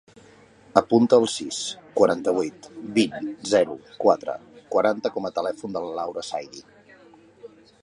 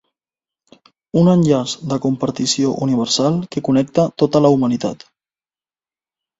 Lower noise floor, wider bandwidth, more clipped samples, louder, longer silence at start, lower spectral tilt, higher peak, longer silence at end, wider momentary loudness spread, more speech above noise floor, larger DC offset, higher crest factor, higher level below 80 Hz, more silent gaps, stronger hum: second, -52 dBFS vs under -90 dBFS; first, 11 kHz vs 8 kHz; neither; second, -24 LUFS vs -17 LUFS; second, 0.75 s vs 1.15 s; second, -4.5 dB/octave vs -6 dB/octave; about the same, 0 dBFS vs 0 dBFS; second, 0.35 s vs 1.45 s; first, 13 LU vs 8 LU; second, 29 dB vs over 74 dB; neither; first, 24 dB vs 18 dB; second, -66 dBFS vs -56 dBFS; neither; neither